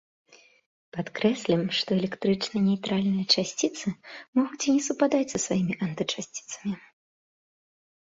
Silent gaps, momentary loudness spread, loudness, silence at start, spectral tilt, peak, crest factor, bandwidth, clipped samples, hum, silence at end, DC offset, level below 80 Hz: 4.28-4.33 s; 11 LU; -27 LUFS; 0.95 s; -4.5 dB/octave; -8 dBFS; 20 dB; 8 kHz; under 0.1%; none; 1.35 s; under 0.1%; -66 dBFS